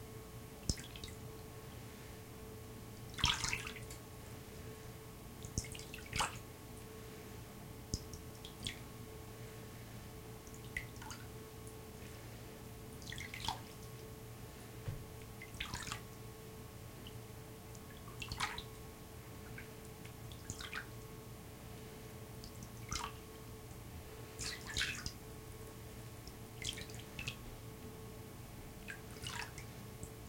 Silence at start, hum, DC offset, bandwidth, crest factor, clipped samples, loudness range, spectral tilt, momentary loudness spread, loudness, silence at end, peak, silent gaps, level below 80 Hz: 0 s; none; under 0.1%; 17 kHz; 30 dB; under 0.1%; 7 LU; -3 dB/octave; 11 LU; -46 LUFS; 0 s; -16 dBFS; none; -58 dBFS